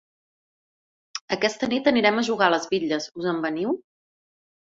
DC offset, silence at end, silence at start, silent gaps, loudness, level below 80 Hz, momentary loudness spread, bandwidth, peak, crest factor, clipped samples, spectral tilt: under 0.1%; 0.85 s; 1.15 s; 1.21-1.28 s; -23 LUFS; -66 dBFS; 10 LU; 7.8 kHz; -4 dBFS; 22 dB; under 0.1%; -4 dB/octave